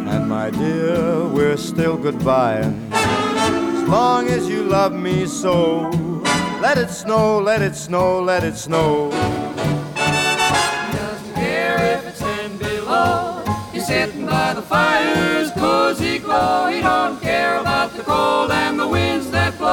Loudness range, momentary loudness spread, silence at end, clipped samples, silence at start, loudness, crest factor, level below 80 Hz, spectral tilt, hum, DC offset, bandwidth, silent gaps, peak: 2 LU; 6 LU; 0 s; under 0.1%; 0 s; -18 LUFS; 14 dB; -44 dBFS; -5 dB/octave; none; under 0.1%; 19.5 kHz; none; -4 dBFS